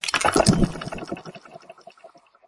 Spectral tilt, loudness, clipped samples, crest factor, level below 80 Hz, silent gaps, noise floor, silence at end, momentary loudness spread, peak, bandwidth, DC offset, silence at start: -4.5 dB/octave; -22 LUFS; under 0.1%; 22 dB; -38 dBFS; none; -51 dBFS; 0.4 s; 22 LU; -2 dBFS; 11.5 kHz; under 0.1%; 0.05 s